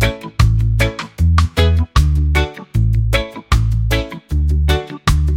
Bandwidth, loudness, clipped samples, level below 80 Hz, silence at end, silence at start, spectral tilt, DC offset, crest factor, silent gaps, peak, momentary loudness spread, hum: 16 kHz; -16 LUFS; under 0.1%; -18 dBFS; 0 s; 0 s; -6 dB/octave; under 0.1%; 14 dB; none; 0 dBFS; 5 LU; none